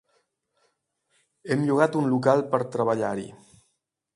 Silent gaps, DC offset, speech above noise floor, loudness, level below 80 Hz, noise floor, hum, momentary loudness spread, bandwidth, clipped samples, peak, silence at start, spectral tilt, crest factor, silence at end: none; under 0.1%; 52 dB; -24 LUFS; -68 dBFS; -76 dBFS; none; 12 LU; 11.5 kHz; under 0.1%; -4 dBFS; 1.45 s; -7.5 dB/octave; 22 dB; 0.8 s